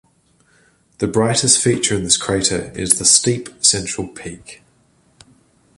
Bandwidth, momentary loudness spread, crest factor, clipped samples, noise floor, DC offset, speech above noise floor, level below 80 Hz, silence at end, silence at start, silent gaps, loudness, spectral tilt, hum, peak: 16 kHz; 16 LU; 20 dB; under 0.1%; -57 dBFS; under 0.1%; 40 dB; -46 dBFS; 1.25 s; 1 s; none; -15 LUFS; -2.5 dB/octave; none; 0 dBFS